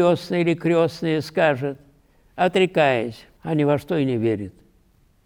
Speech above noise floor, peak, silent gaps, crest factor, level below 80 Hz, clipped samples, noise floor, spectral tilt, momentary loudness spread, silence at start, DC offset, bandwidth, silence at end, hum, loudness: 38 dB; -6 dBFS; none; 16 dB; -58 dBFS; under 0.1%; -58 dBFS; -7 dB/octave; 13 LU; 0 s; under 0.1%; 15.5 kHz; 0.75 s; none; -21 LUFS